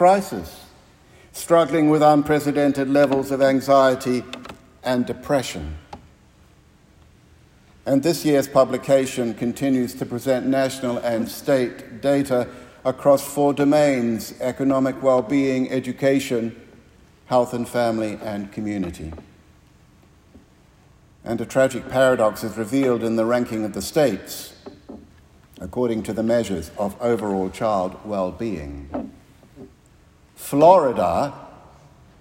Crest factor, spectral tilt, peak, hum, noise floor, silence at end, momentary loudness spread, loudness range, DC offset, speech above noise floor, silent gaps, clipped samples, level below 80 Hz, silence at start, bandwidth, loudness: 20 dB; -6 dB/octave; 0 dBFS; none; -53 dBFS; 0.65 s; 16 LU; 9 LU; under 0.1%; 33 dB; none; under 0.1%; -52 dBFS; 0 s; 16.5 kHz; -21 LUFS